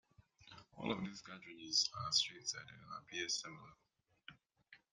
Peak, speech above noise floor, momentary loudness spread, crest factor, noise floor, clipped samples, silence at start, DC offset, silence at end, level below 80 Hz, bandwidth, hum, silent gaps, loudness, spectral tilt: -20 dBFS; 25 dB; 25 LU; 24 dB; -68 dBFS; under 0.1%; 0.4 s; under 0.1%; 0.15 s; -78 dBFS; 11.5 kHz; none; none; -39 LUFS; -1.5 dB/octave